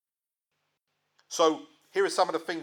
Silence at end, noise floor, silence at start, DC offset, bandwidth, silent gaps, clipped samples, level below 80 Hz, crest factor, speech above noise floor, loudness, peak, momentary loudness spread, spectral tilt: 0 s; under -90 dBFS; 1.3 s; under 0.1%; 18 kHz; none; under 0.1%; under -90 dBFS; 20 dB; over 63 dB; -28 LUFS; -10 dBFS; 11 LU; -2.5 dB/octave